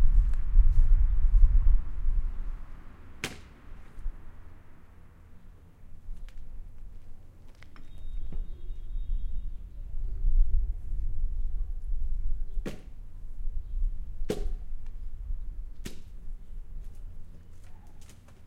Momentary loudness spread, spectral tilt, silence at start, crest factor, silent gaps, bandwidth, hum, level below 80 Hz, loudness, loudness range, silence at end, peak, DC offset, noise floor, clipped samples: 25 LU; -6.5 dB/octave; 0 s; 20 dB; none; 6.8 kHz; none; -28 dBFS; -34 LUFS; 19 LU; 0 s; -6 dBFS; under 0.1%; -50 dBFS; under 0.1%